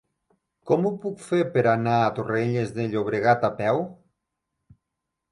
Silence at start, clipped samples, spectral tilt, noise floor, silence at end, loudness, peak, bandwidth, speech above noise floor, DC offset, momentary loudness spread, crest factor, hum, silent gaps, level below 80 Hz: 0.65 s; under 0.1%; -7.5 dB/octave; -83 dBFS; 1.4 s; -24 LUFS; -6 dBFS; 11.5 kHz; 60 dB; under 0.1%; 6 LU; 18 dB; none; none; -62 dBFS